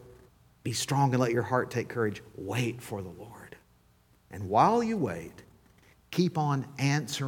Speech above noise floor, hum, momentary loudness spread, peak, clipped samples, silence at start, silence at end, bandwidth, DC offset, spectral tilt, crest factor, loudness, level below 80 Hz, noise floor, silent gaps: 35 dB; none; 18 LU; -10 dBFS; under 0.1%; 0 s; 0 s; 17.5 kHz; under 0.1%; -5.5 dB/octave; 22 dB; -29 LUFS; -64 dBFS; -64 dBFS; none